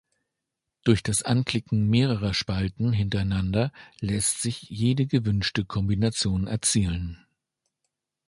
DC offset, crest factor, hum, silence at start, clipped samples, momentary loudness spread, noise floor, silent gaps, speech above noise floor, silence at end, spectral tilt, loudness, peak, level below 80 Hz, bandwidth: under 0.1%; 20 dB; none; 0.85 s; under 0.1%; 6 LU; -84 dBFS; none; 60 dB; 1.1 s; -5 dB/octave; -25 LUFS; -6 dBFS; -42 dBFS; 11.5 kHz